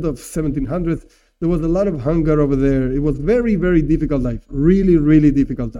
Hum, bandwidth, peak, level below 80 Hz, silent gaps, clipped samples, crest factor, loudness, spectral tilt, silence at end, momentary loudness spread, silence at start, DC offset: none; 12 kHz; -2 dBFS; -28 dBFS; none; under 0.1%; 14 dB; -17 LUFS; -9 dB/octave; 0 s; 10 LU; 0 s; under 0.1%